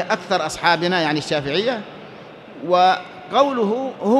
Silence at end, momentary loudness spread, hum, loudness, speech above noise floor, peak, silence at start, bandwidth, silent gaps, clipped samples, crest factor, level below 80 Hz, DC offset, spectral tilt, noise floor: 0 s; 21 LU; none; -19 LUFS; 20 dB; 0 dBFS; 0 s; 12.5 kHz; none; under 0.1%; 18 dB; -58 dBFS; under 0.1%; -4.5 dB/octave; -39 dBFS